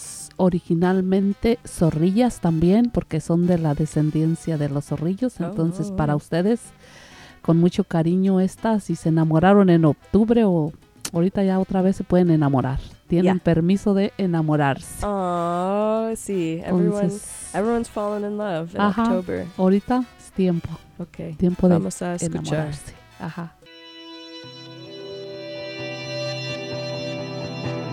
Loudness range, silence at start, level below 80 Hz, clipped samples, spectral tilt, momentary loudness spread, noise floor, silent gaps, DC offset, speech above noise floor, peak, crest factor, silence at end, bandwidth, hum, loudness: 12 LU; 0 s; -44 dBFS; under 0.1%; -7 dB/octave; 16 LU; -43 dBFS; none; under 0.1%; 23 dB; -2 dBFS; 18 dB; 0 s; 13.5 kHz; none; -21 LUFS